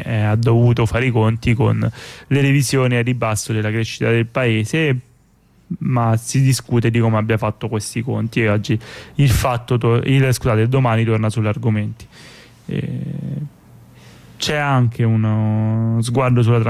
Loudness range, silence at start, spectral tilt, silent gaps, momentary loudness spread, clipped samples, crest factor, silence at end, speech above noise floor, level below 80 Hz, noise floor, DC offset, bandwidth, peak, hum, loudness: 5 LU; 0 s; -6.5 dB/octave; none; 10 LU; under 0.1%; 12 dB; 0 s; 37 dB; -40 dBFS; -53 dBFS; under 0.1%; 14.5 kHz; -6 dBFS; none; -18 LUFS